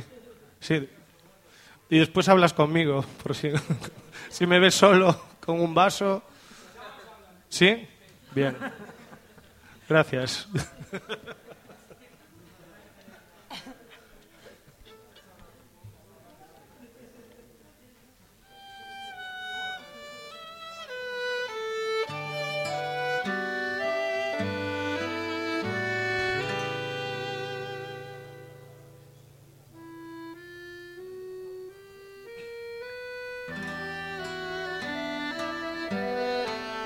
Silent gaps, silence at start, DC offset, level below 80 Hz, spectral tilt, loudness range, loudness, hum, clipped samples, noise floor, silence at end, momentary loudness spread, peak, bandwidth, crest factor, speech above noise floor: none; 0 s; under 0.1%; -62 dBFS; -4.5 dB/octave; 22 LU; -27 LUFS; none; under 0.1%; -58 dBFS; 0 s; 23 LU; -4 dBFS; 17 kHz; 26 dB; 35 dB